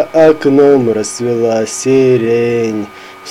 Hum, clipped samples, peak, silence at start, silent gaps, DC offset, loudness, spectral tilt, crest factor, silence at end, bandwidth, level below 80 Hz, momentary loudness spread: none; 0.1%; 0 dBFS; 0 s; none; under 0.1%; -11 LUFS; -5.5 dB/octave; 12 dB; 0 s; 13 kHz; -52 dBFS; 10 LU